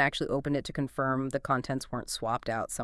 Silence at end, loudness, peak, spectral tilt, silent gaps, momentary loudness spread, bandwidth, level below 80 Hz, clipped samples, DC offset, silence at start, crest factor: 0 s; -31 LUFS; -12 dBFS; -5 dB/octave; none; 5 LU; 12 kHz; -54 dBFS; under 0.1%; under 0.1%; 0 s; 20 dB